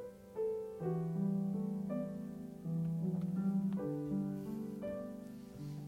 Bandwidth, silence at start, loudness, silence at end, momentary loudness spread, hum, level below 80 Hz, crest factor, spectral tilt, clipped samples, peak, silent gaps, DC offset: 15.5 kHz; 0 s; -40 LUFS; 0 s; 11 LU; none; -68 dBFS; 12 dB; -10 dB/octave; under 0.1%; -28 dBFS; none; under 0.1%